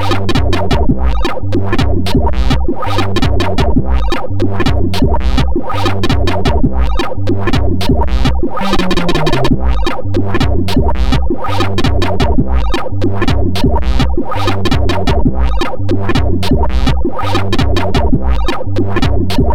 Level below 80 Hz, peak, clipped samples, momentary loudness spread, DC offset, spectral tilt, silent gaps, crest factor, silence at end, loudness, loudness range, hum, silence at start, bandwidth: -16 dBFS; 0 dBFS; under 0.1%; 3 LU; 20%; -6.5 dB/octave; none; 14 dB; 0 s; -15 LUFS; 0 LU; none; 0 s; 14.5 kHz